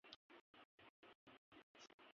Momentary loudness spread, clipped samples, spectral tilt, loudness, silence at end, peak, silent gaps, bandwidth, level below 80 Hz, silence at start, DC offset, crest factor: 5 LU; under 0.1%; -0.5 dB/octave; -67 LUFS; 0.05 s; -40 dBFS; 0.16-0.29 s, 0.41-0.54 s, 0.65-0.78 s, 0.90-1.03 s, 1.15-1.27 s, 1.38-1.52 s, 1.63-1.75 s, 1.94-1.99 s; 7 kHz; under -90 dBFS; 0.05 s; under 0.1%; 28 dB